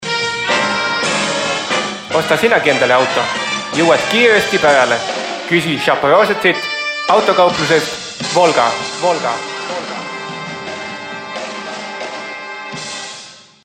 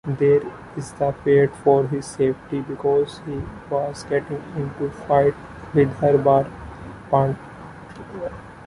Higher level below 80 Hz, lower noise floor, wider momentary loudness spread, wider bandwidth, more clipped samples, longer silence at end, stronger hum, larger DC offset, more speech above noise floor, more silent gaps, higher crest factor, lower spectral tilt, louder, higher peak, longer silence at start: second, -54 dBFS vs -48 dBFS; about the same, -37 dBFS vs -39 dBFS; second, 14 LU vs 18 LU; first, 16 kHz vs 11.5 kHz; neither; first, 0.25 s vs 0 s; neither; neither; first, 24 dB vs 18 dB; neither; about the same, 16 dB vs 18 dB; second, -3 dB/octave vs -7.5 dB/octave; first, -15 LUFS vs -21 LUFS; first, 0 dBFS vs -4 dBFS; about the same, 0 s vs 0.05 s